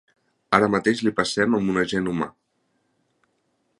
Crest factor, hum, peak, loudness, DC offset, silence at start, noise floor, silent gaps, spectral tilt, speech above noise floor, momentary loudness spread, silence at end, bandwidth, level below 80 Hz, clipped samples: 24 dB; none; -2 dBFS; -22 LUFS; under 0.1%; 0.5 s; -71 dBFS; none; -5 dB/octave; 49 dB; 8 LU; 1.5 s; 11.5 kHz; -56 dBFS; under 0.1%